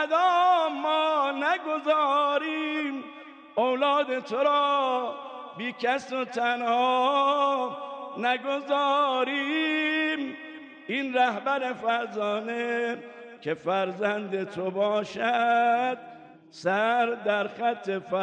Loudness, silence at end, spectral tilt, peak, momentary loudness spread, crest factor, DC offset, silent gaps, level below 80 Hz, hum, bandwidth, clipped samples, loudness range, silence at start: -26 LUFS; 0 s; -4.5 dB/octave; -12 dBFS; 11 LU; 14 dB; under 0.1%; none; -82 dBFS; none; 9.2 kHz; under 0.1%; 3 LU; 0 s